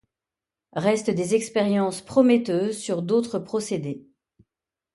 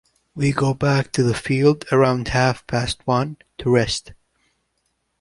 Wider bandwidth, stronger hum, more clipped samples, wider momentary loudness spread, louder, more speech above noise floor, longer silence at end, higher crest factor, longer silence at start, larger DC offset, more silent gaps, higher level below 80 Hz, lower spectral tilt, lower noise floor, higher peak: about the same, 11.5 kHz vs 11.5 kHz; neither; neither; first, 10 LU vs 7 LU; second, -23 LUFS vs -20 LUFS; first, 66 dB vs 52 dB; second, 0.95 s vs 1.1 s; about the same, 18 dB vs 18 dB; first, 0.75 s vs 0.35 s; neither; neither; second, -66 dBFS vs -44 dBFS; about the same, -5.5 dB/octave vs -6 dB/octave; first, -89 dBFS vs -71 dBFS; second, -6 dBFS vs -2 dBFS